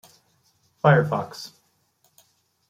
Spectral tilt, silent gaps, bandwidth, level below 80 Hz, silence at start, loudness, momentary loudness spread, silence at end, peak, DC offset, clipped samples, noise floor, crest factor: -7 dB/octave; none; 14.5 kHz; -64 dBFS; 0.85 s; -21 LUFS; 21 LU; 1.2 s; -2 dBFS; under 0.1%; under 0.1%; -66 dBFS; 24 dB